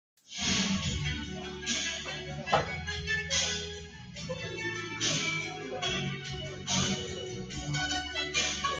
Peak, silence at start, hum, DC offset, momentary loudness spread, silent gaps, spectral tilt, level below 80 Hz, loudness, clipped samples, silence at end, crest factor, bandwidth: -12 dBFS; 0.3 s; none; under 0.1%; 10 LU; none; -2.5 dB/octave; -50 dBFS; -32 LUFS; under 0.1%; 0 s; 20 dB; 10 kHz